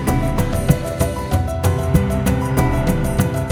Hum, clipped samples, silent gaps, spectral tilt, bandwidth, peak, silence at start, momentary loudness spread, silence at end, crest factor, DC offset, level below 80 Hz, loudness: none; under 0.1%; none; -6.5 dB/octave; over 20 kHz; 0 dBFS; 0 s; 3 LU; 0 s; 18 dB; under 0.1%; -24 dBFS; -19 LUFS